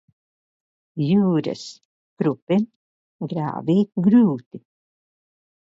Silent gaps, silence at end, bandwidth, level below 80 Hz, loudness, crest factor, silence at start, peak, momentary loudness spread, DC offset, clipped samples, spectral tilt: 1.85-2.17 s, 2.42-2.47 s, 2.76-3.19 s, 4.46-4.51 s; 1.1 s; 7.8 kHz; -66 dBFS; -21 LUFS; 16 dB; 0.95 s; -6 dBFS; 16 LU; under 0.1%; under 0.1%; -8.5 dB/octave